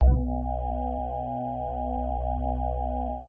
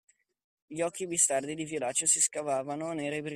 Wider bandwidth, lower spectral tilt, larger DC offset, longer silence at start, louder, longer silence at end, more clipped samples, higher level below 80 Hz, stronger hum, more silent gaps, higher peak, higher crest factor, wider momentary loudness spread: second, 3.3 kHz vs 15.5 kHz; first, -12.5 dB/octave vs -2.5 dB/octave; neither; second, 0 s vs 0.7 s; about the same, -30 LUFS vs -29 LUFS; about the same, 0 s vs 0 s; neither; first, -28 dBFS vs -76 dBFS; neither; neither; about the same, -10 dBFS vs -10 dBFS; about the same, 18 dB vs 22 dB; second, 3 LU vs 10 LU